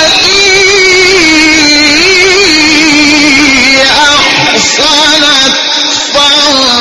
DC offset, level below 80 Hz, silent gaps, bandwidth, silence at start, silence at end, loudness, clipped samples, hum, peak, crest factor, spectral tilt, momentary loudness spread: under 0.1%; -32 dBFS; none; 12 kHz; 0 s; 0 s; -3 LUFS; 2%; none; 0 dBFS; 6 dB; -1 dB/octave; 2 LU